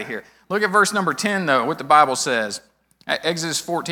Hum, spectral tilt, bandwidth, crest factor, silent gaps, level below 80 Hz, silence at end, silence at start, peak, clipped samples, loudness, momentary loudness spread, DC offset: none; -3 dB/octave; over 20 kHz; 18 dB; none; -66 dBFS; 0 s; 0 s; -2 dBFS; under 0.1%; -19 LUFS; 15 LU; under 0.1%